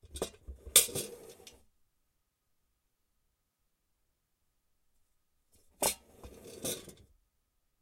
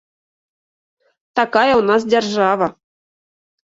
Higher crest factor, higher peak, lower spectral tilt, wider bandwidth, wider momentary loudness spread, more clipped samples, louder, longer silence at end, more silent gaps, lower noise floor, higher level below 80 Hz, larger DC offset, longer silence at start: first, 32 dB vs 18 dB; second, -8 dBFS vs -2 dBFS; second, -0.5 dB/octave vs -4.5 dB/octave; first, 16.5 kHz vs 7.8 kHz; first, 27 LU vs 8 LU; neither; second, -31 LUFS vs -16 LUFS; second, 0.9 s vs 1.05 s; neither; second, -80 dBFS vs under -90 dBFS; about the same, -60 dBFS vs -60 dBFS; neither; second, 0.1 s vs 1.35 s